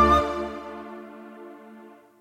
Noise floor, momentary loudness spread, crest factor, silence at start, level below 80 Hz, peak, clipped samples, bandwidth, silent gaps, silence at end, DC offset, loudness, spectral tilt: -48 dBFS; 24 LU; 20 dB; 0 s; -40 dBFS; -6 dBFS; under 0.1%; 15.5 kHz; none; 0.3 s; under 0.1%; -26 LUFS; -6 dB/octave